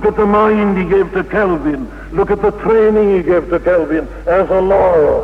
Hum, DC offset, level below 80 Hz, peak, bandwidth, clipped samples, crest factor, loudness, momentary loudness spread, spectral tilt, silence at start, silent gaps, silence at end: none; under 0.1%; -32 dBFS; -2 dBFS; 6 kHz; under 0.1%; 10 dB; -13 LUFS; 7 LU; -8.5 dB/octave; 0 s; none; 0 s